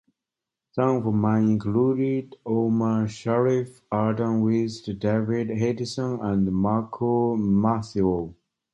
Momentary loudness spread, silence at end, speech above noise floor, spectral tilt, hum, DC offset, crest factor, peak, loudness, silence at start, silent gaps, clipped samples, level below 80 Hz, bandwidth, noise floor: 6 LU; 0.4 s; 64 dB; -8 dB/octave; none; under 0.1%; 16 dB; -8 dBFS; -24 LUFS; 0.75 s; none; under 0.1%; -52 dBFS; 9 kHz; -87 dBFS